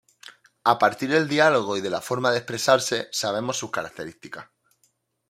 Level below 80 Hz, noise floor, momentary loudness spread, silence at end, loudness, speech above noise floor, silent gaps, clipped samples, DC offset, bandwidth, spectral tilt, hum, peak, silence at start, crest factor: -70 dBFS; -69 dBFS; 17 LU; 0.85 s; -23 LUFS; 46 dB; none; under 0.1%; under 0.1%; 16 kHz; -3.5 dB/octave; none; -2 dBFS; 0.65 s; 22 dB